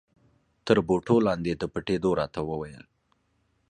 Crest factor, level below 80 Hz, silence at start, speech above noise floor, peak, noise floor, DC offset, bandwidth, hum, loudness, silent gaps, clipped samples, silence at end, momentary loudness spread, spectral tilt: 22 dB; -52 dBFS; 0.65 s; 45 dB; -6 dBFS; -71 dBFS; under 0.1%; 10 kHz; none; -26 LUFS; none; under 0.1%; 0.9 s; 12 LU; -7 dB/octave